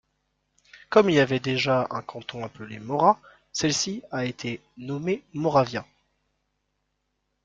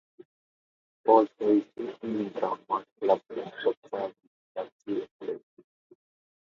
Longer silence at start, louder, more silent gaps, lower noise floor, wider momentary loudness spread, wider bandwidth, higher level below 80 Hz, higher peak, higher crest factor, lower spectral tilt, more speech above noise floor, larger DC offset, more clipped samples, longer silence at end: first, 0.75 s vs 0.2 s; first, -25 LUFS vs -29 LUFS; second, none vs 0.25-1.04 s, 2.92-2.96 s, 3.77-3.82 s, 4.27-4.55 s, 4.72-4.79 s, 5.11-5.20 s; second, -77 dBFS vs under -90 dBFS; about the same, 15 LU vs 16 LU; first, 9.2 kHz vs 6.8 kHz; first, -62 dBFS vs -80 dBFS; about the same, -4 dBFS vs -6 dBFS; about the same, 22 dB vs 24 dB; second, -4.5 dB/octave vs -7.5 dB/octave; second, 52 dB vs over 63 dB; neither; neither; first, 1.6 s vs 1.1 s